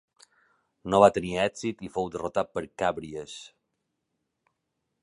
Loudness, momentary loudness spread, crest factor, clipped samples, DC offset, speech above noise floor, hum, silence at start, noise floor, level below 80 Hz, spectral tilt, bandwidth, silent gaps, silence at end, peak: -26 LUFS; 19 LU; 26 dB; under 0.1%; under 0.1%; 54 dB; none; 0.85 s; -81 dBFS; -58 dBFS; -5 dB/octave; 11.5 kHz; none; 1.55 s; -4 dBFS